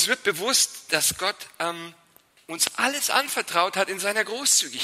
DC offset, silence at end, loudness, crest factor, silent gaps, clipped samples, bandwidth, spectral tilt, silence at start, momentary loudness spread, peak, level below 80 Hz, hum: under 0.1%; 0 s; -23 LUFS; 22 dB; none; under 0.1%; 16 kHz; 0 dB/octave; 0 s; 10 LU; -4 dBFS; -66 dBFS; none